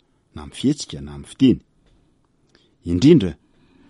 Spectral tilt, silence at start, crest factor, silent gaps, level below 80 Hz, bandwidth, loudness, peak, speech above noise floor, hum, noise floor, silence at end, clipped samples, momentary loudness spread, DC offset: -7 dB/octave; 0.35 s; 20 dB; none; -46 dBFS; 11.5 kHz; -18 LUFS; -2 dBFS; 43 dB; none; -61 dBFS; 0.55 s; under 0.1%; 22 LU; under 0.1%